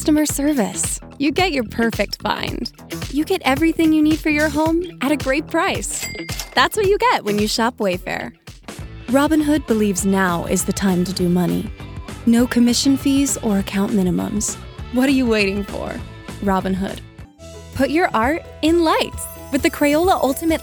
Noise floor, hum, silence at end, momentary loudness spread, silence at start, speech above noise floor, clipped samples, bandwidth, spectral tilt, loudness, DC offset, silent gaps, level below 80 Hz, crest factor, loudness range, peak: -38 dBFS; none; 0 s; 13 LU; 0 s; 20 dB; under 0.1%; over 20 kHz; -4.5 dB/octave; -19 LUFS; under 0.1%; none; -38 dBFS; 18 dB; 3 LU; 0 dBFS